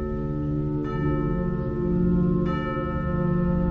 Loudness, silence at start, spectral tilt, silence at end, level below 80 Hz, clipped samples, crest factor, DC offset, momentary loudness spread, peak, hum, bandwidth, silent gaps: -25 LUFS; 0 s; -11 dB/octave; 0 s; -34 dBFS; under 0.1%; 12 dB; under 0.1%; 5 LU; -12 dBFS; none; 4.4 kHz; none